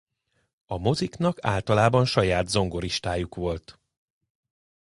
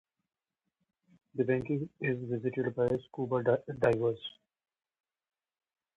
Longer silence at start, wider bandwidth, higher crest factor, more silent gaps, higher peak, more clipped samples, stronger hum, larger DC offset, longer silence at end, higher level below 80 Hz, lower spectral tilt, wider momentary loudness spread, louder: second, 0.7 s vs 1.35 s; first, 11.5 kHz vs 9.2 kHz; about the same, 22 dB vs 20 dB; neither; first, -6 dBFS vs -14 dBFS; neither; neither; neither; second, 1.15 s vs 1.65 s; first, -44 dBFS vs -64 dBFS; second, -5.5 dB/octave vs -8.5 dB/octave; first, 10 LU vs 7 LU; first, -25 LUFS vs -32 LUFS